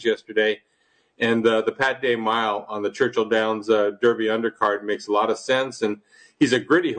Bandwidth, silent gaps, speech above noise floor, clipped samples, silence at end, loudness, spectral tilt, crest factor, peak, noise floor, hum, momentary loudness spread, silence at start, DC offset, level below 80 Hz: 9.4 kHz; none; 43 dB; under 0.1%; 0 s; -22 LUFS; -4.5 dB/octave; 16 dB; -6 dBFS; -65 dBFS; none; 7 LU; 0 s; under 0.1%; -68 dBFS